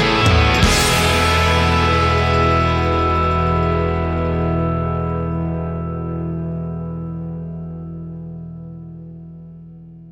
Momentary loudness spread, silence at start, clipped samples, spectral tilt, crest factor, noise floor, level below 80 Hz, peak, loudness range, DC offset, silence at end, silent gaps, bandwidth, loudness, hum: 20 LU; 0 s; under 0.1%; -5 dB/octave; 16 dB; -38 dBFS; -28 dBFS; -2 dBFS; 14 LU; under 0.1%; 0 s; none; 16.5 kHz; -17 LUFS; 60 Hz at -60 dBFS